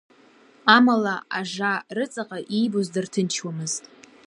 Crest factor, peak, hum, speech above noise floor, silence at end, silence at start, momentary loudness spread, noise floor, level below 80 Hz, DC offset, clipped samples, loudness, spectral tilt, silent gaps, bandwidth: 22 dB; -2 dBFS; none; 31 dB; 0.5 s; 0.65 s; 13 LU; -54 dBFS; -76 dBFS; under 0.1%; under 0.1%; -23 LUFS; -4 dB/octave; none; 11.5 kHz